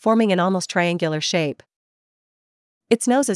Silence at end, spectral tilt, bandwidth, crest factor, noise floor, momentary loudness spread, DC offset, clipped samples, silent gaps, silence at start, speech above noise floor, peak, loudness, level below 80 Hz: 0 s; -4.5 dB/octave; 12 kHz; 18 dB; under -90 dBFS; 6 LU; under 0.1%; under 0.1%; 1.76-2.81 s; 0.05 s; over 71 dB; -2 dBFS; -20 LUFS; -76 dBFS